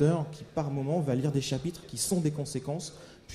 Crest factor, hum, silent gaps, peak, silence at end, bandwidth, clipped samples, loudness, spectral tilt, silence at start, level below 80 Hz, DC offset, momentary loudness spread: 18 dB; none; none; -12 dBFS; 0 s; 14.5 kHz; under 0.1%; -31 LUFS; -6 dB/octave; 0 s; -58 dBFS; under 0.1%; 8 LU